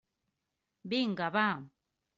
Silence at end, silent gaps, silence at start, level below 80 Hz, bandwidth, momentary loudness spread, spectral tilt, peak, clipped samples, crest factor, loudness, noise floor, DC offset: 0.5 s; none; 0.85 s; -78 dBFS; 7.6 kHz; 11 LU; -3 dB/octave; -16 dBFS; under 0.1%; 20 dB; -32 LUFS; -86 dBFS; under 0.1%